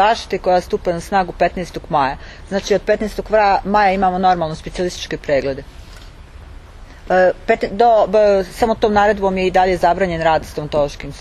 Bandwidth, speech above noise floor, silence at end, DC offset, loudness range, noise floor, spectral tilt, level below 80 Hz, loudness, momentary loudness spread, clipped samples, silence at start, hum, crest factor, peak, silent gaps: 13.5 kHz; 21 dB; 0 s; under 0.1%; 6 LU; -37 dBFS; -5.5 dB/octave; -36 dBFS; -16 LUFS; 9 LU; under 0.1%; 0 s; none; 16 dB; 0 dBFS; none